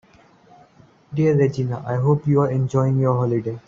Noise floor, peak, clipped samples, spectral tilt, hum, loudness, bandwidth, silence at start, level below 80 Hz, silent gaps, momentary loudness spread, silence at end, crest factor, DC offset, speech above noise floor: -52 dBFS; -4 dBFS; under 0.1%; -9.5 dB/octave; none; -20 LUFS; 7.4 kHz; 1.1 s; -56 dBFS; none; 6 LU; 0.1 s; 16 dB; under 0.1%; 33 dB